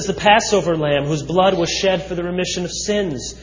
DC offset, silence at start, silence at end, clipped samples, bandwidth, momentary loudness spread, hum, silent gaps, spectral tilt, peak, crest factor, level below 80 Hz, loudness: under 0.1%; 0 s; 0 s; under 0.1%; 7.6 kHz; 8 LU; none; none; -4 dB/octave; 0 dBFS; 18 dB; -40 dBFS; -18 LUFS